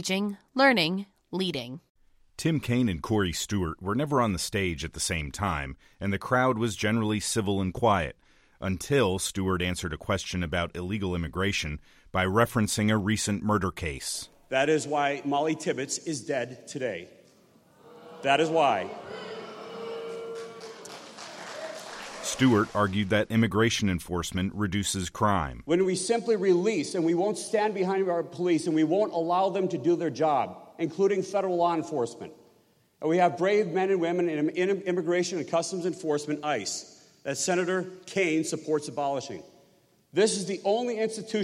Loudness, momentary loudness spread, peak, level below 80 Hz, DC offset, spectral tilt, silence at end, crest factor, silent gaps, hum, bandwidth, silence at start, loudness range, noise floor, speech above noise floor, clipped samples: -27 LUFS; 13 LU; -8 dBFS; -52 dBFS; under 0.1%; -4.5 dB/octave; 0 s; 20 dB; 1.90-1.95 s; none; 16 kHz; 0 s; 4 LU; -64 dBFS; 37 dB; under 0.1%